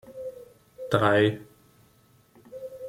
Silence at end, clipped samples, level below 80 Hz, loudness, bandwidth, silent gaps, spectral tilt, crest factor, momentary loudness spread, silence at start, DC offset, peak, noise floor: 0 s; under 0.1%; -64 dBFS; -23 LUFS; 16 kHz; none; -6.5 dB/octave; 24 dB; 21 LU; 0.05 s; under 0.1%; -6 dBFS; -61 dBFS